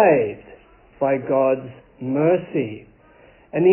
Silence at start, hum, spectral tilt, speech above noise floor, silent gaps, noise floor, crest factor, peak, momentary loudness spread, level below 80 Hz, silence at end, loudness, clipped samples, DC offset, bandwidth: 0 s; none; -12 dB/octave; 31 dB; none; -51 dBFS; 18 dB; -4 dBFS; 17 LU; -58 dBFS; 0 s; -21 LUFS; under 0.1%; under 0.1%; 3.2 kHz